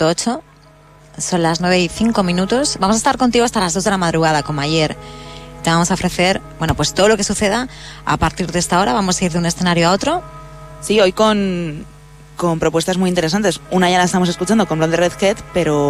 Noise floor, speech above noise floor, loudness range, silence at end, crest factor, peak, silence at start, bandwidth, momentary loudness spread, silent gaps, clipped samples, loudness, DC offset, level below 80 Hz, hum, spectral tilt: -45 dBFS; 29 dB; 2 LU; 0 s; 14 dB; -2 dBFS; 0 s; 15.5 kHz; 10 LU; none; under 0.1%; -16 LUFS; under 0.1%; -38 dBFS; none; -4.5 dB/octave